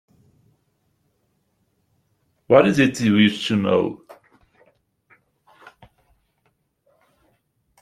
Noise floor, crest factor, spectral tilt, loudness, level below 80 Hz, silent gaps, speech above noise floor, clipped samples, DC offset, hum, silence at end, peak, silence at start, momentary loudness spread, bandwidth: -69 dBFS; 22 dB; -6 dB/octave; -18 LUFS; -60 dBFS; none; 51 dB; under 0.1%; under 0.1%; none; 3.85 s; -2 dBFS; 2.5 s; 9 LU; 12.5 kHz